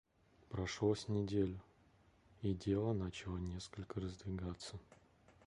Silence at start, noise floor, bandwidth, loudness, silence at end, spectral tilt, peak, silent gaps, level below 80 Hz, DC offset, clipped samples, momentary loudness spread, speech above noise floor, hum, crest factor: 0.5 s; -70 dBFS; 11 kHz; -42 LUFS; 0.15 s; -6.5 dB/octave; -24 dBFS; none; -58 dBFS; under 0.1%; under 0.1%; 11 LU; 29 dB; none; 18 dB